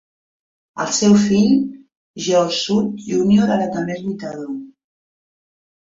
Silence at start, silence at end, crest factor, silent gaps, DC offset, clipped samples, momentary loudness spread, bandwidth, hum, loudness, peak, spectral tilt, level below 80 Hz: 0.75 s; 1.25 s; 16 dB; 1.97-2.14 s; under 0.1%; under 0.1%; 15 LU; 7.8 kHz; none; -17 LUFS; -4 dBFS; -5 dB/octave; -56 dBFS